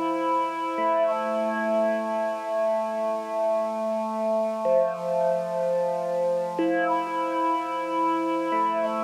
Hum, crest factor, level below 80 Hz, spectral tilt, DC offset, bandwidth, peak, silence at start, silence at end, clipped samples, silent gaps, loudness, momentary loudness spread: none; 14 dB; -80 dBFS; -5.5 dB/octave; under 0.1%; 13.5 kHz; -12 dBFS; 0 s; 0 s; under 0.1%; none; -25 LUFS; 4 LU